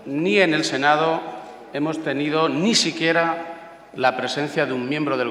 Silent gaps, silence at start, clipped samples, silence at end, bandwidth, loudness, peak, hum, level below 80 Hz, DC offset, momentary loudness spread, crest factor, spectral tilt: none; 0 s; under 0.1%; 0 s; 13.5 kHz; -21 LUFS; -2 dBFS; none; -66 dBFS; under 0.1%; 15 LU; 20 dB; -4 dB/octave